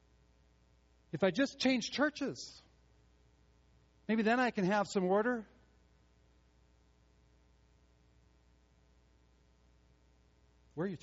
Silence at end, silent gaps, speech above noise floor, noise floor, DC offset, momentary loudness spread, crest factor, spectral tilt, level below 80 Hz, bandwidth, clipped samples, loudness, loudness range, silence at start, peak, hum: 0.05 s; none; 35 dB; -68 dBFS; under 0.1%; 16 LU; 22 dB; -4 dB/octave; -70 dBFS; 7.6 kHz; under 0.1%; -34 LUFS; 5 LU; 1.15 s; -16 dBFS; none